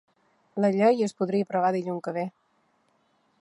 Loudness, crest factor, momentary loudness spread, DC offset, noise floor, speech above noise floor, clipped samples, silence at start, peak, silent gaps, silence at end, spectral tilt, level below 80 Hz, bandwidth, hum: -26 LUFS; 18 dB; 11 LU; under 0.1%; -69 dBFS; 44 dB; under 0.1%; 0.55 s; -10 dBFS; none; 1.1 s; -7 dB/octave; -80 dBFS; 11 kHz; none